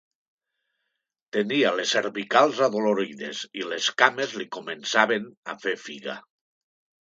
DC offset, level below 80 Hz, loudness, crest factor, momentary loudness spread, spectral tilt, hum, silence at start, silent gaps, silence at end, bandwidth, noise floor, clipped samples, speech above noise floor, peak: under 0.1%; -78 dBFS; -24 LUFS; 26 dB; 13 LU; -3 dB/octave; none; 1.35 s; 5.37-5.43 s; 0.85 s; 9.2 kHz; -82 dBFS; under 0.1%; 57 dB; 0 dBFS